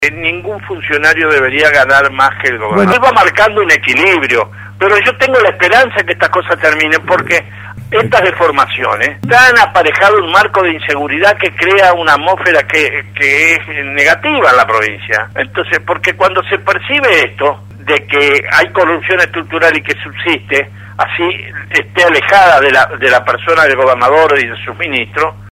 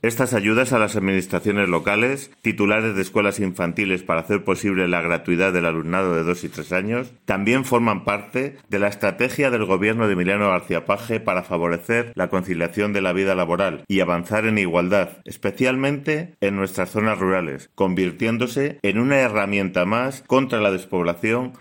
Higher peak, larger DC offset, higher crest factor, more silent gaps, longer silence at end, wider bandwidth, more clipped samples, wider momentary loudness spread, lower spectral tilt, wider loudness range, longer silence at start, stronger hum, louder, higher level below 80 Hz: first, 0 dBFS vs -4 dBFS; neither; second, 10 dB vs 18 dB; neither; about the same, 0 s vs 0.05 s; about the same, 16.5 kHz vs 17 kHz; first, 0.4% vs under 0.1%; first, 8 LU vs 5 LU; second, -4 dB/octave vs -5.5 dB/octave; about the same, 3 LU vs 2 LU; about the same, 0 s vs 0.05 s; neither; first, -9 LUFS vs -21 LUFS; first, -46 dBFS vs -58 dBFS